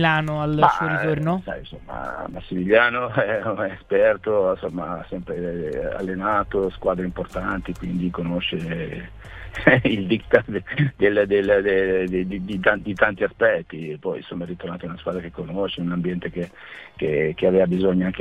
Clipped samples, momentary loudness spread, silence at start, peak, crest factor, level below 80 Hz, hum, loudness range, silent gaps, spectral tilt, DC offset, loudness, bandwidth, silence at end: under 0.1%; 13 LU; 0 s; 0 dBFS; 22 dB; -44 dBFS; none; 6 LU; none; -7.5 dB/octave; under 0.1%; -22 LUFS; 9.8 kHz; 0 s